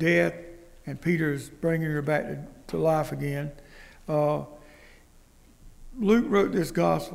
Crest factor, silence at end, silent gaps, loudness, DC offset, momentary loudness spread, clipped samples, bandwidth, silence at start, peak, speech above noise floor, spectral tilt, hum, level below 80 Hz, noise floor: 18 dB; 0 s; none; -27 LUFS; under 0.1%; 19 LU; under 0.1%; 16 kHz; 0 s; -10 dBFS; 29 dB; -7 dB/octave; none; -50 dBFS; -55 dBFS